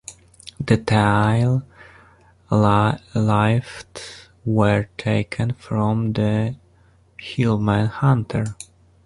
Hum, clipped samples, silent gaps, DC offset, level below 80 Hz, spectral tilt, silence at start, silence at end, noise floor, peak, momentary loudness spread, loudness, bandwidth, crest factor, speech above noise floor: none; under 0.1%; none; under 0.1%; -46 dBFS; -7 dB/octave; 0.1 s; 0.4 s; -55 dBFS; -2 dBFS; 19 LU; -20 LUFS; 11.5 kHz; 18 dB; 36 dB